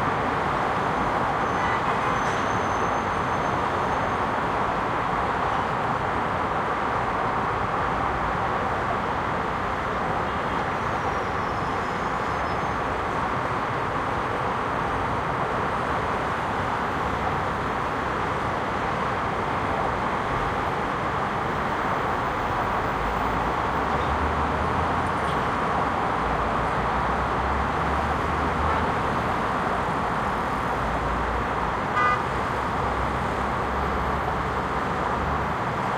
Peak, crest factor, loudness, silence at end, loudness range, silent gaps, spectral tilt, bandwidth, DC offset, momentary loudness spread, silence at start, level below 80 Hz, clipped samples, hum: -10 dBFS; 16 dB; -25 LUFS; 0 s; 2 LU; none; -6 dB/octave; 16.5 kHz; under 0.1%; 2 LU; 0 s; -38 dBFS; under 0.1%; none